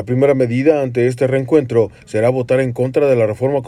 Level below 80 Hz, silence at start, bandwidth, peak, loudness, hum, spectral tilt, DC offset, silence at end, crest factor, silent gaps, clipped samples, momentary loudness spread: -52 dBFS; 0 s; 11.5 kHz; -2 dBFS; -15 LUFS; none; -8 dB/octave; under 0.1%; 0 s; 14 dB; none; under 0.1%; 3 LU